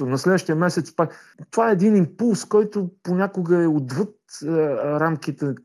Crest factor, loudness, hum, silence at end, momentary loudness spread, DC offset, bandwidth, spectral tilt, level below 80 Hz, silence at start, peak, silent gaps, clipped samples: 14 dB; -21 LUFS; none; 0.05 s; 9 LU; under 0.1%; 12.5 kHz; -7 dB/octave; -74 dBFS; 0 s; -6 dBFS; none; under 0.1%